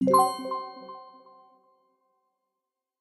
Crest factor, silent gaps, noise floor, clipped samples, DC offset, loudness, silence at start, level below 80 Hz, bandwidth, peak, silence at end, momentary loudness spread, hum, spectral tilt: 22 dB; none; -86 dBFS; under 0.1%; under 0.1%; -26 LUFS; 0 s; -74 dBFS; 12.5 kHz; -8 dBFS; 1.95 s; 23 LU; none; -5 dB/octave